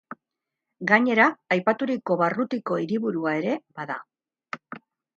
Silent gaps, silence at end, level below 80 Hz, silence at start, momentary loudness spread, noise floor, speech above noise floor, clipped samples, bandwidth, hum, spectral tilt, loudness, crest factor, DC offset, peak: none; 0.4 s; -76 dBFS; 0.1 s; 19 LU; -86 dBFS; 62 dB; under 0.1%; 7.4 kHz; none; -7 dB/octave; -24 LUFS; 22 dB; under 0.1%; -4 dBFS